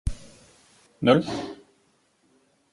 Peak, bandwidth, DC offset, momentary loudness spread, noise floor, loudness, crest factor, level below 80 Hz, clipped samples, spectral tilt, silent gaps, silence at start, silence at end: -4 dBFS; 11.5 kHz; under 0.1%; 26 LU; -66 dBFS; -24 LUFS; 24 dB; -42 dBFS; under 0.1%; -6.5 dB/octave; none; 0.05 s; 1.2 s